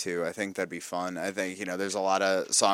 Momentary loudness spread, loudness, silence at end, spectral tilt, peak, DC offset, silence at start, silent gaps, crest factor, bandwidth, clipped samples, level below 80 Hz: 9 LU; -29 LUFS; 0 s; -2 dB/octave; -8 dBFS; under 0.1%; 0 s; none; 20 dB; 17 kHz; under 0.1%; -78 dBFS